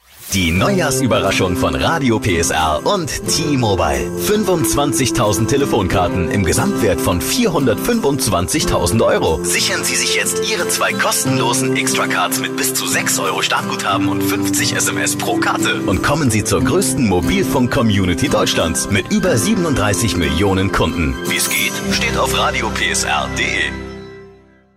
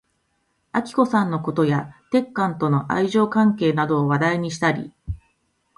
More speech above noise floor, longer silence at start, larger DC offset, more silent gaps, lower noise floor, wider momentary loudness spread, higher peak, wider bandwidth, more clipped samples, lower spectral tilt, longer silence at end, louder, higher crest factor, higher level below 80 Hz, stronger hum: second, 29 dB vs 49 dB; second, 0.15 s vs 0.75 s; neither; neither; second, -45 dBFS vs -69 dBFS; second, 3 LU vs 9 LU; about the same, -4 dBFS vs -4 dBFS; first, 16 kHz vs 11.5 kHz; neither; second, -4 dB/octave vs -7 dB/octave; second, 0.45 s vs 0.6 s; first, -15 LUFS vs -21 LUFS; about the same, 12 dB vs 16 dB; first, -34 dBFS vs -48 dBFS; neither